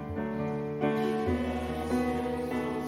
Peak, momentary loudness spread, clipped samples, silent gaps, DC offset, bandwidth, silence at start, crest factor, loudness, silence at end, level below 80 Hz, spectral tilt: -14 dBFS; 4 LU; under 0.1%; none; under 0.1%; 15.5 kHz; 0 s; 16 dB; -31 LUFS; 0 s; -50 dBFS; -7 dB/octave